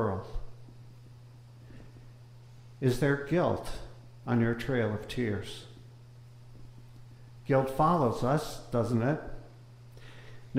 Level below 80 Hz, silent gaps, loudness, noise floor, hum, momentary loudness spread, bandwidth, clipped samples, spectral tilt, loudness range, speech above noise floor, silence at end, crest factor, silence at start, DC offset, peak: -50 dBFS; none; -30 LUFS; -51 dBFS; none; 25 LU; 16 kHz; under 0.1%; -7 dB/octave; 4 LU; 23 dB; 0 s; 18 dB; 0 s; under 0.1%; -14 dBFS